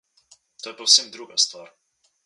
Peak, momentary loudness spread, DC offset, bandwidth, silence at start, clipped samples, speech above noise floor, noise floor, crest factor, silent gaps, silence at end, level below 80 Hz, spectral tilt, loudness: 0 dBFS; 21 LU; under 0.1%; 11.5 kHz; 0.65 s; under 0.1%; 35 dB; -58 dBFS; 24 dB; none; 0.65 s; -86 dBFS; 2.5 dB/octave; -19 LUFS